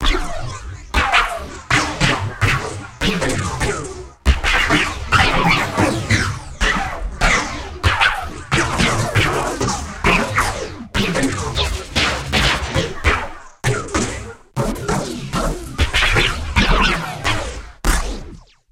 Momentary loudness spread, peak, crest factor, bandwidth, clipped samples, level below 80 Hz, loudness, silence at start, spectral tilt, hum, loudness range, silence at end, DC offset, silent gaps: 10 LU; -2 dBFS; 18 dB; 16.5 kHz; under 0.1%; -26 dBFS; -18 LUFS; 0 s; -4 dB/octave; none; 3 LU; 0.3 s; under 0.1%; none